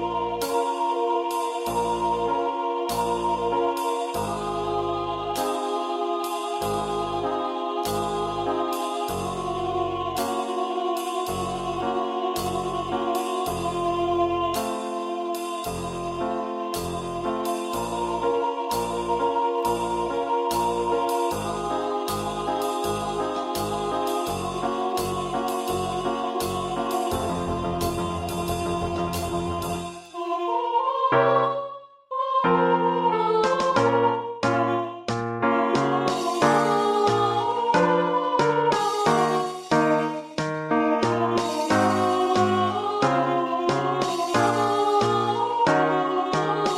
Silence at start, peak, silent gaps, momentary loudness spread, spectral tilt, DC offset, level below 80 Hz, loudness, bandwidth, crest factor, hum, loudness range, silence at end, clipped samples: 0 s; -4 dBFS; none; 7 LU; -5 dB/octave; under 0.1%; -50 dBFS; -25 LUFS; 16 kHz; 20 dB; none; 5 LU; 0 s; under 0.1%